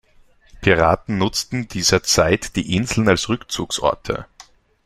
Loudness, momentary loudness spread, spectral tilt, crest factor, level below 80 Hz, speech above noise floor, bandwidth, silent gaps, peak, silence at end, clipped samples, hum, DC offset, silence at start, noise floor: -19 LUFS; 9 LU; -4 dB/octave; 20 dB; -40 dBFS; 33 dB; 15.5 kHz; none; 0 dBFS; 0.45 s; under 0.1%; none; under 0.1%; 0.55 s; -52 dBFS